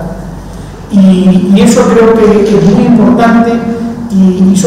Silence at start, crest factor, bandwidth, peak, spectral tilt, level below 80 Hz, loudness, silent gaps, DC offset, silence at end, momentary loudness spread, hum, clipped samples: 0 s; 6 dB; 12 kHz; 0 dBFS; -7 dB/octave; -30 dBFS; -6 LUFS; none; under 0.1%; 0 s; 17 LU; none; 3%